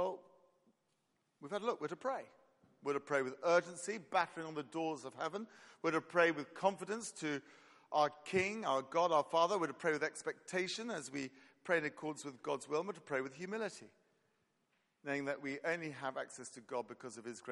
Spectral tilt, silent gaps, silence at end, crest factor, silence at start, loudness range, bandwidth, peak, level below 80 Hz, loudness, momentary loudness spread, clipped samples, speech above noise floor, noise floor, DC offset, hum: -4 dB/octave; none; 0 s; 24 dB; 0 s; 7 LU; 11.5 kHz; -16 dBFS; -86 dBFS; -39 LUFS; 13 LU; under 0.1%; 43 dB; -82 dBFS; under 0.1%; none